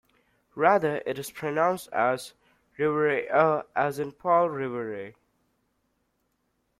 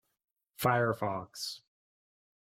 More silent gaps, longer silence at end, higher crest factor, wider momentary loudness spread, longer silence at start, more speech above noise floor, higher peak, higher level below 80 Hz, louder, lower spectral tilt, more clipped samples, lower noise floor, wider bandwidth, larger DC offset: neither; first, 1.7 s vs 1 s; about the same, 20 dB vs 22 dB; about the same, 12 LU vs 11 LU; about the same, 0.55 s vs 0.6 s; second, 49 dB vs over 58 dB; first, -8 dBFS vs -14 dBFS; about the same, -70 dBFS vs -70 dBFS; first, -26 LUFS vs -33 LUFS; about the same, -5.5 dB/octave vs -5 dB/octave; neither; second, -74 dBFS vs under -90 dBFS; about the same, 15 kHz vs 16.5 kHz; neither